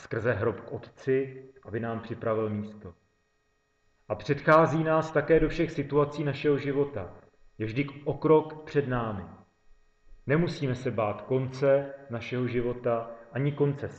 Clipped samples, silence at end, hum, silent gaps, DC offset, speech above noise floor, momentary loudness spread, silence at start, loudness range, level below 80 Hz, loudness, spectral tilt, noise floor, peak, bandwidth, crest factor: under 0.1%; 0 s; none; none; under 0.1%; 44 dB; 14 LU; 0 s; 7 LU; -50 dBFS; -28 LUFS; -8 dB/octave; -72 dBFS; -8 dBFS; 8 kHz; 22 dB